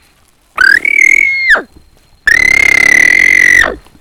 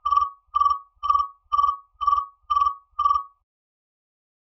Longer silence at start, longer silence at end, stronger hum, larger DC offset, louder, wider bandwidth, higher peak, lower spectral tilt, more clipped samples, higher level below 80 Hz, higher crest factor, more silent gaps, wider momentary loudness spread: first, 0.55 s vs 0.05 s; second, 0.25 s vs 1.15 s; neither; neither; first, -5 LUFS vs -23 LUFS; first, over 20 kHz vs 6 kHz; first, 0 dBFS vs -8 dBFS; about the same, -1 dB/octave vs -1.5 dB/octave; first, 3% vs under 0.1%; first, -36 dBFS vs -52 dBFS; second, 8 dB vs 16 dB; neither; about the same, 6 LU vs 4 LU